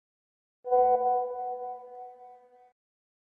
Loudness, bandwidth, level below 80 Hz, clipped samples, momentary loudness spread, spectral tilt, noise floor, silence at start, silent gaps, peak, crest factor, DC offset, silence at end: -28 LUFS; 2.4 kHz; -72 dBFS; under 0.1%; 22 LU; -8 dB/octave; -54 dBFS; 0.65 s; none; -14 dBFS; 18 dB; under 0.1%; 0.9 s